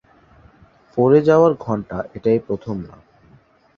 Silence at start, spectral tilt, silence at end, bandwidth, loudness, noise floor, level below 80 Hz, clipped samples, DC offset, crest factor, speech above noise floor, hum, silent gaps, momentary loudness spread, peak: 0.95 s; -9 dB/octave; 0.9 s; 6.8 kHz; -18 LUFS; -53 dBFS; -52 dBFS; under 0.1%; under 0.1%; 18 dB; 35 dB; none; none; 16 LU; -2 dBFS